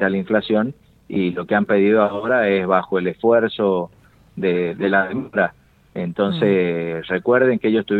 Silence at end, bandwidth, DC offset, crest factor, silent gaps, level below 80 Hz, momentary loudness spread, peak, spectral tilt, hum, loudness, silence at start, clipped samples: 0 s; 4.6 kHz; under 0.1%; 18 dB; none; -58 dBFS; 8 LU; -2 dBFS; -9 dB/octave; none; -19 LUFS; 0 s; under 0.1%